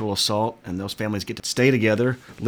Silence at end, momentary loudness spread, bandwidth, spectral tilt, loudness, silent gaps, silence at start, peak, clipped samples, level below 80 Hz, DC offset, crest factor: 0 s; 9 LU; over 20 kHz; -4.5 dB/octave; -23 LUFS; none; 0 s; -6 dBFS; under 0.1%; -56 dBFS; under 0.1%; 18 dB